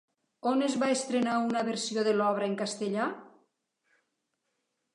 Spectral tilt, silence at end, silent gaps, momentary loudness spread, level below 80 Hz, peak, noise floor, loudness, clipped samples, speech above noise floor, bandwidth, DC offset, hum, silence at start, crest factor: -4 dB/octave; 1.65 s; none; 6 LU; -84 dBFS; -14 dBFS; -81 dBFS; -30 LUFS; under 0.1%; 52 dB; 11 kHz; under 0.1%; none; 0.45 s; 16 dB